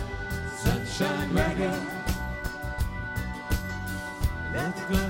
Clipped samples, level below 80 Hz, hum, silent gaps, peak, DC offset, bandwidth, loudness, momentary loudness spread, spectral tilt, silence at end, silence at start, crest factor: under 0.1%; -36 dBFS; none; none; -12 dBFS; under 0.1%; 17 kHz; -30 LUFS; 7 LU; -5.5 dB/octave; 0 s; 0 s; 18 dB